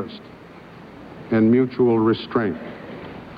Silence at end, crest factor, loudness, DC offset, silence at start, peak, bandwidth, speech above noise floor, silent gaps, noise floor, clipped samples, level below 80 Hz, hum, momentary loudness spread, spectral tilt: 0 s; 16 dB; -19 LUFS; under 0.1%; 0 s; -6 dBFS; 5.2 kHz; 23 dB; none; -42 dBFS; under 0.1%; -56 dBFS; none; 24 LU; -9.5 dB/octave